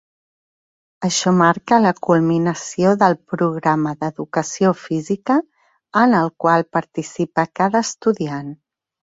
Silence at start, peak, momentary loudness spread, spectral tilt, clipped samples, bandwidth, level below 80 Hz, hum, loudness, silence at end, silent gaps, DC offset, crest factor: 1 s; -2 dBFS; 9 LU; -5.5 dB/octave; under 0.1%; 8 kHz; -60 dBFS; none; -18 LUFS; 0.65 s; none; under 0.1%; 18 dB